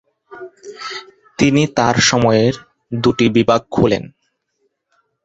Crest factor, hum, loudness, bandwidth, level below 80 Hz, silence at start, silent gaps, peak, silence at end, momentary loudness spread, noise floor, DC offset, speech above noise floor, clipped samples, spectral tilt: 16 dB; none; -15 LUFS; 8.2 kHz; -46 dBFS; 0.3 s; none; 0 dBFS; 1.2 s; 22 LU; -68 dBFS; under 0.1%; 53 dB; under 0.1%; -5 dB/octave